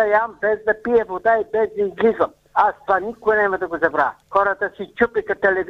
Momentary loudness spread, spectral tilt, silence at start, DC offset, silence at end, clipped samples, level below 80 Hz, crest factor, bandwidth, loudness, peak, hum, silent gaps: 3 LU; -7 dB/octave; 0 s; under 0.1%; 0 s; under 0.1%; -52 dBFS; 16 dB; 6.4 kHz; -20 LUFS; -4 dBFS; none; none